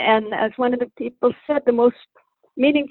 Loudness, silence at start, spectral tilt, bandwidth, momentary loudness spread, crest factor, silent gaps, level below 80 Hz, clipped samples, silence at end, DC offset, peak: -20 LUFS; 0 s; -8.5 dB/octave; 4.2 kHz; 7 LU; 16 dB; none; -62 dBFS; under 0.1%; 0.05 s; under 0.1%; -4 dBFS